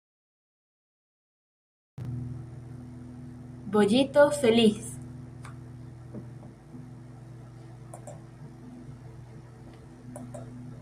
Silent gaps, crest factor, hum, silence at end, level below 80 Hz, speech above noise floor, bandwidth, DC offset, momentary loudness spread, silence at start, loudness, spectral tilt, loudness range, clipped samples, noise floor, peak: none; 22 dB; none; 0.05 s; -60 dBFS; 26 dB; 15 kHz; under 0.1%; 25 LU; 2 s; -25 LUFS; -5.5 dB/octave; 20 LU; under 0.1%; -47 dBFS; -8 dBFS